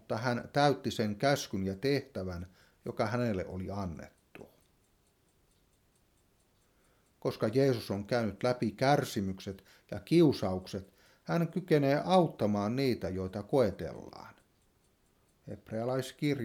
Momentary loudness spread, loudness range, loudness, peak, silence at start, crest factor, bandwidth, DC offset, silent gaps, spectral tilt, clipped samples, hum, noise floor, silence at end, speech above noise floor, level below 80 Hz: 17 LU; 9 LU; -32 LUFS; -12 dBFS; 0.1 s; 22 dB; 17.5 kHz; under 0.1%; none; -6.5 dB/octave; under 0.1%; none; -71 dBFS; 0 s; 39 dB; -64 dBFS